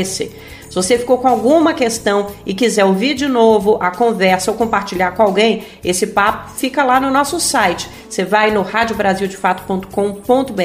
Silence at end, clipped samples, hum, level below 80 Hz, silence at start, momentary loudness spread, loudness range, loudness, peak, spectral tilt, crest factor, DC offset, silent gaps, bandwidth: 0 s; under 0.1%; none; -44 dBFS; 0 s; 8 LU; 2 LU; -15 LUFS; 0 dBFS; -4 dB/octave; 14 dB; under 0.1%; none; 15.5 kHz